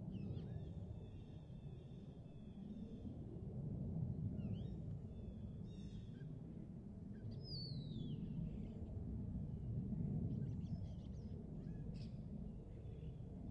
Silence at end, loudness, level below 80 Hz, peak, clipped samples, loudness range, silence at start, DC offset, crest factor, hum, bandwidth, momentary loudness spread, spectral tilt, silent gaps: 0 s; -50 LUFS; -58 dBFS; -34 dBFS; under 0.1%; 5 LU; 0 s; under 0.1%; 16 dB; none; 7.6 kHz; 9 LU; -9.5 dB/octave; none